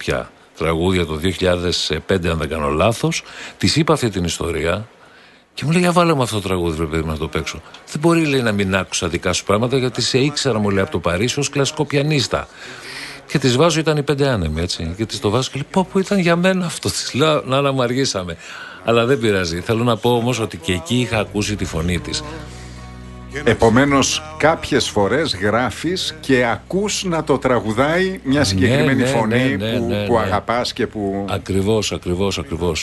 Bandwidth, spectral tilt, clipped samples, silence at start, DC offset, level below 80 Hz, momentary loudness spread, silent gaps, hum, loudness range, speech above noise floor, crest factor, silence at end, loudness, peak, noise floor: 12.5 kHz; -5 dB/octave; under 0.1%; 0 s; under 0.1%; -38 dBFS; 9 LU; none; none; 3 LU; 29 dB; 18 dB; 0 s; -18 LUFS; 0 dBFS; -47 dBFS